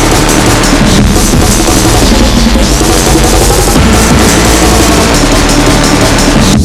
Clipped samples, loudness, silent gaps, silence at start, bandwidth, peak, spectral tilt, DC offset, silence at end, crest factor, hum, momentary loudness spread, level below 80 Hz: 6%; -6 LUFS; none; 0 s; over 20 kHz; 0 dBFS; -4 dB/octave; under 0.1%; 0 s; 6 dB; none; 2 LU; -12 dBFS